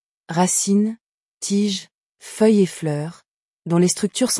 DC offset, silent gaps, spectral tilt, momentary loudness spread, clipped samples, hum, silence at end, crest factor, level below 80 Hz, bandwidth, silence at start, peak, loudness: under 0.1%; 1.01-1.41 s, 1.95-2.13 s, 3.28-3.60 s; -4.5 dB/octave; 15 LU; under 0.1%; none; 0 s; 16 dB; -68 dBFS; 12 kHz; 0.3 s; -6 dBFS; -20 LUFS